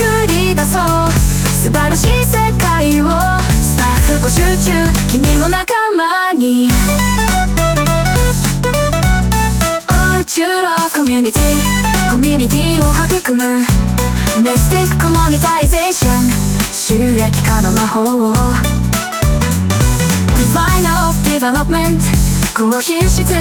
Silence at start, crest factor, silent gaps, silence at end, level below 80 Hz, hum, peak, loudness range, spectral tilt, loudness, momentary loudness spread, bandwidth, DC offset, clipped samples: 0 s; 10 dB; none; 0 s; -18 dBFS; none; -2 dBFS; 1 LU; -4.5 dB/octave; -13 LUFS; 2 LU; over 20 kHz; under 0.1%; under 0.1%